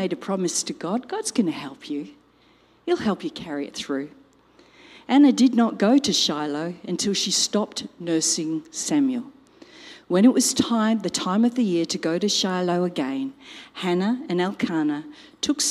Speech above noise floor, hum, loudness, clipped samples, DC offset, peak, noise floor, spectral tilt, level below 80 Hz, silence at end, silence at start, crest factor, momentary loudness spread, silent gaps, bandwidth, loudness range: 35 dB; none; -23 LUFS; under 0.1%; under 0.1%; -4 dBFS; -58 dBFS; -3.5 dB/octave; -66 dBFS; 0 s; 0 s; 18 dB; 14 LU; none; 15.5 kHz; 7 LU